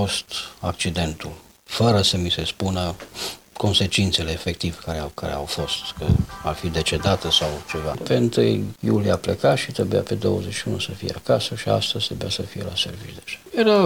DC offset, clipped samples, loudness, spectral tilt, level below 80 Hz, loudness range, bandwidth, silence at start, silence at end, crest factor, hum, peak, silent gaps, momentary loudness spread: 0.1%; under 0.1%; -23 LUFS; -5 dB/octave; -40 dBFS; 3 LU; 17 kHz; 0 s; 0 s; 18 dB; none; -6 dBFS; none; 11 LU